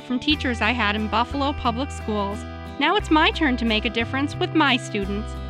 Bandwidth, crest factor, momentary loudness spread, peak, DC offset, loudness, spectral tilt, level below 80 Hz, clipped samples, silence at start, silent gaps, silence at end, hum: 11.5 kHz; 16 dB; 8 LU; -6 dBFS; under 0.1%; -22 LUFS; -5 dB/octave; -36 dBFS; under 0.1%; 0 s; none; 0 s; none